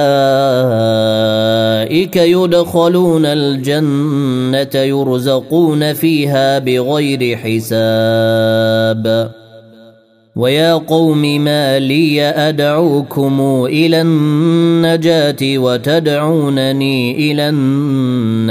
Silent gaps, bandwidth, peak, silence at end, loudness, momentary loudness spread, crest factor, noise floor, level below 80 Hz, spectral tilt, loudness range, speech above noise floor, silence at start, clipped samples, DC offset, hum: none; 16 kHz; 0 dBFS; 0 s; -12 LUFS; 4 LU; 12 dB; -45 dBFS; -56 dBFS; -6.5 dB/octave; 2 LU; 33 dB; 0 s; under 0.1%; under 0.1%; none